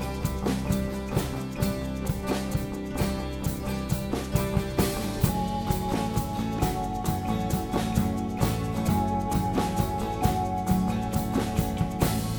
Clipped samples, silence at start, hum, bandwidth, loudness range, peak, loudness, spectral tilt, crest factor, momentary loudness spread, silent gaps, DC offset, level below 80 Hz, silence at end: under 0.1%; 0 s; none; over 20 kHz; 3 LU; -8 dBFS; -28 LUFS; -6 dB/octave; 20 dB; 4 LU; none; under 0.1%; -36 dBFS; 0 s